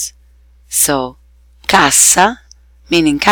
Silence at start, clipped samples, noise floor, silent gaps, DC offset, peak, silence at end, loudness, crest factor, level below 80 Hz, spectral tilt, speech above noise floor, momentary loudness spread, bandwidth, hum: 0 s; under 0.1%; -46 dBFS; none; under 0.1%; 0 dBFS; 0 s; -11 LUFS; 14 dB; -42 dBFS; -1.5 dB/octave; 35 dB; 17 LU; 19.5 kHz; none